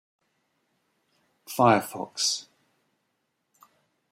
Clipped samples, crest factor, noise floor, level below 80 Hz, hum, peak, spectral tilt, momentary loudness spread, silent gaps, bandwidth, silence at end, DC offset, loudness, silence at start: under 0.1%; 24 dB; -77 dBFS; -74 dBFS; none; -6 dBFS; -3.5 dB/octave; 14 LU; none; 16 kHz; 1.7 s; under 0.1%; -25 LUFS; 1.5 s